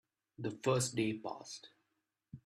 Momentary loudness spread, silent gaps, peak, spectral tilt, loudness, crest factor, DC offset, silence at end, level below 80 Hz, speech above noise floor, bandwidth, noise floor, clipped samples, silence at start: 17 LU; none; -20 dBFS; -4.5 dB/octave; -37 LUFS; 20 dB; under 0.1%; 0.05 s; -72 dBFS; 48 dB; 14 kHz; -85 dBFS; under 0.1%; 0.4 s